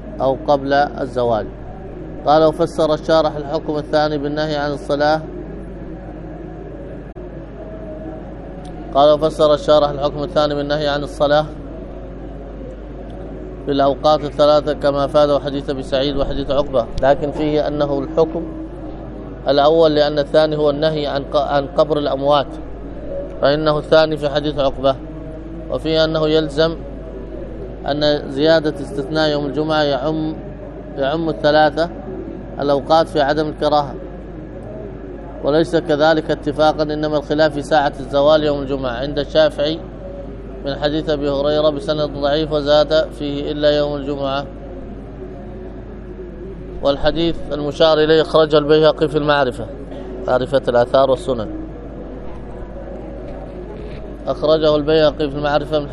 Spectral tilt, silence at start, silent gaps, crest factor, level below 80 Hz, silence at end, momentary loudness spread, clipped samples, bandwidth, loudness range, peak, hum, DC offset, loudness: -6.5 dB/octave; 0 s; none; 18 dB; -34 dBFS; 0 s; 18 LU; under 0.1%; 11 kHz; 6 LU; 0 dBFS; none; under 0.1%; -17 LUFS